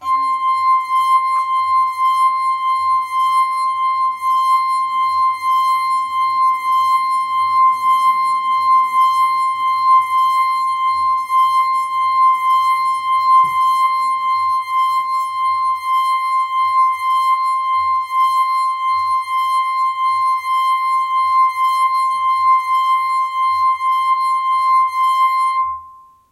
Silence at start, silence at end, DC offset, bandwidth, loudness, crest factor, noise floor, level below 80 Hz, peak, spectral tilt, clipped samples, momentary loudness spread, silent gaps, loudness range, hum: 0 s; 0.35 s; under 0.1%; 15.5 kHz; -15 LUFS; 10 dB; -42 dBFS; -64 dBFS; -4 dBFS; 0.5 dB/octave; under 0.1%; 4 LU; none; 2 LU; none